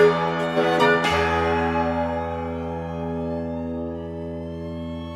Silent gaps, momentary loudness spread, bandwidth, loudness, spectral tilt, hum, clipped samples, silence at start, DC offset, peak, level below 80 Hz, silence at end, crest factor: none; 14 LU; 14 kHz; -24 LUFS; -6 dB/octave; none; under 0.1%; 0 s; under 0.1%; -4 dBFS; -42 dBFS; 0 s; 18 dB